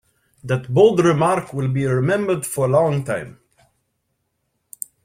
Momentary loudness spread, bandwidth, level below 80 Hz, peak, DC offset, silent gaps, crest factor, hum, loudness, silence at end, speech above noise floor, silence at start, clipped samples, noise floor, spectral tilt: 17 LU; 16.5 kHz; -56 dBFS; -2 dBFS; under 0.1%; none; 18 dB; none; -19 LUFS; 1.75 s; 54 dB; 0.45 s; under 0.1%; -72 dBFS; -6.5 dB/octave